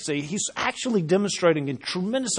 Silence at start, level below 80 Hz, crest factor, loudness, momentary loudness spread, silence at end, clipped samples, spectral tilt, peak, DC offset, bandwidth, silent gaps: 0 s; -66 dBFS; 18 dB; -24 LUFS; 6 LU; 0 s; under 0.1%; -4 dB/octave; -6 dBFS; under 0.1%; 10.5 kHz; none